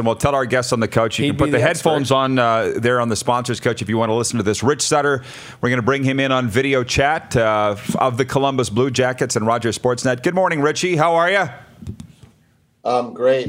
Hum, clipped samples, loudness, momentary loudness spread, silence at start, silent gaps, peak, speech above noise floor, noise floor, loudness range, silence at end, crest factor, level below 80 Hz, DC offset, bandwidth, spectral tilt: none; under 0.1%; -18 LUFS; 5 LU; 0 s; none; 0 dBFS; 40 dB; -57 dBFS; 2 LU; 0 s; 18 dB; -48 dBFS; under 0.1%; 16 kHz; -4.5 dB/octave